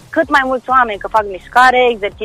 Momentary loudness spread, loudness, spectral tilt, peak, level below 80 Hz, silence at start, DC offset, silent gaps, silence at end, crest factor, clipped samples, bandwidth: 7 LU; -13 LUFS; -3.5 dB/octave; 0 dBFS; -42 dBFS; 0.1 s; under 0.1%; none; 0 s; 14 dB; under 0.1%; 15 kHz